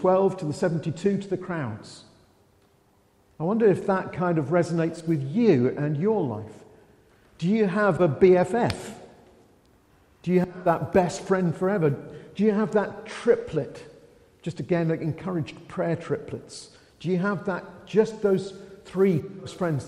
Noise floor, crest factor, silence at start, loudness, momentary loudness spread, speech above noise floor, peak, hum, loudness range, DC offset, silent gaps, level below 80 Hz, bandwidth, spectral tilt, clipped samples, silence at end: -62 dBFS; 18 dB; 0 s; -25 LUFS; 15 LU; 38 dB; -6 dBFS; none; 5 LU; under 0.1%; none; -58 dBFS; 11.5 kHz; -7.5 dB/octave; under 0.1%; 0 s